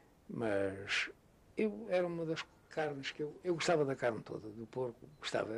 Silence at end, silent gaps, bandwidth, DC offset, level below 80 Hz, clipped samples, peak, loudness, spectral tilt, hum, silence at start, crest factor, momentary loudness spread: 0 s; none; 12.5 kHz; under 0.1%; -72 dBFS; under 0.1%; -22 dBFS; -38 LUFS; -5 dB/octave; none; 0.3 s; 16 dB; 12 LU